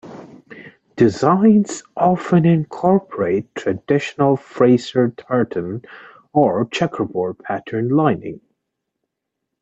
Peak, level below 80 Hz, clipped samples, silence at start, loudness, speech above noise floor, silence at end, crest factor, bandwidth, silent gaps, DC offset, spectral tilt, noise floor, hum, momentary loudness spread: -2 dBFS; -58 dBFS; under 0.1%; 0.05 s; -18 LUFS; 62 dB; 1.25 s; 16 dB; 8.2 kHz; none; under 0.1%; -7.5 dB/octave; -79 dBFS; none; 11 LU